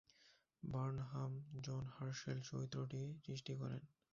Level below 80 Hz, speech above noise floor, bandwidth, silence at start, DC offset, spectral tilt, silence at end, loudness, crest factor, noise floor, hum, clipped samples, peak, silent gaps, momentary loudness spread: -72 dBFS; 28 dB; 7.4 kHz; 0.2 s; under 0.1%; -6.5 dB/octave; 0.25 s; -48 LUFS; 16 dB; -74 dBFS; none; under 0.1%; -32 dBFS; none; 5 LU